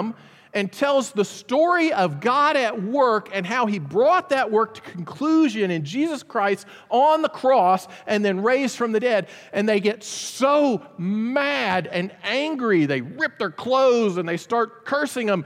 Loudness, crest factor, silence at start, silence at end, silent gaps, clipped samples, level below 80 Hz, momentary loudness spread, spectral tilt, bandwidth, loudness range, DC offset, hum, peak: -21 LUFS; 14 dB; 0 s; 0 s; none; under 0.1%; -74 dBFS; 9 LU; -5 dB/octave; 15.5 kHz; 2 LU; under 0.1%; none; -6 dBFS